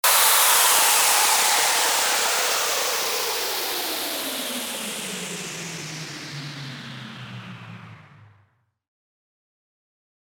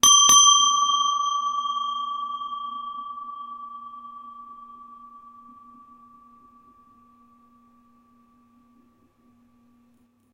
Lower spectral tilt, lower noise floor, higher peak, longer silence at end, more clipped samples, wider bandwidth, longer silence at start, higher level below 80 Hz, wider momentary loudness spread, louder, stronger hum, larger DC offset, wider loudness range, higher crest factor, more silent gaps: first, 0 dB/octave vs 2.5 dB/octave; about the same, -64 dBFS vs -62 dBFS; about the same, -4 dBFS vs -2 dBFS; second, 2.1 s vs 5.3 s; neither; first, over 20 kHz vs 16 kHz; about the same, 0.05 s vs 0.05 s; about the same, -68 dBFS vs -66 dBFS; second, 22 LU vs 29 LU; about the same, -19 LUFS vs -18 LUFS; neither; neither; second, 21 LU vs 27 LU; about the same, 20 dB vs 22 dB; neither